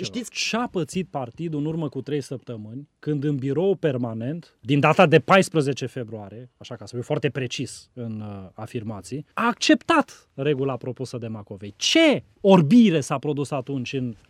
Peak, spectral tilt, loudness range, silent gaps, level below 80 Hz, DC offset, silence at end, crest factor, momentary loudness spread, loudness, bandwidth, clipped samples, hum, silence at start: -2 dBFS; -5.5 dB/octave; 9 LU; none; -64 dBFS; under 0.1%; 0.15 s; 20 dB; 18 LU; -22 LUFS; 13.5 kHz; under 0.1%; none; 0 s